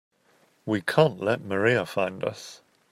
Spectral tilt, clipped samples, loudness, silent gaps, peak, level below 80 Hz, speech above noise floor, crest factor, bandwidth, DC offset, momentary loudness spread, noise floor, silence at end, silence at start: -6 dB/octave; under 0.1%; -25 LUFS; none; -6 dBFS; -68 dBFS; 38 dB; 20 dB; 16 kHz; under 0.1%; 18 LU; -64 dBFS; 0.35 s; 0.65 s